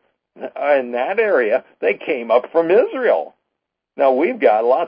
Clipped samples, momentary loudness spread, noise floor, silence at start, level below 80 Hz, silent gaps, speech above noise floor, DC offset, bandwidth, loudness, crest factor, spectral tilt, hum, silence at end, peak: under 0.1%; 7 LU; -79 dBFS; 0.35 s; -74 dBFS; none; 62 dB; under 0.1%; 5.2 kHz; -17 LUFS; 16 dB; -9.5 dB/octave; none; 0 s; -2 dBFS